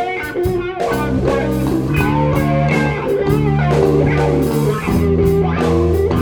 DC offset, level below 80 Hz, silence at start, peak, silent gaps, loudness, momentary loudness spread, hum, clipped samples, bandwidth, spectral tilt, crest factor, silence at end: under 0.1%; -28 dBFS; 0 s; 0 dBFS; none; -16 LUFS; 5 LU; none; under 0.1%; over 20 kHz; -7.5 dB/octave; 14 dB; 0 s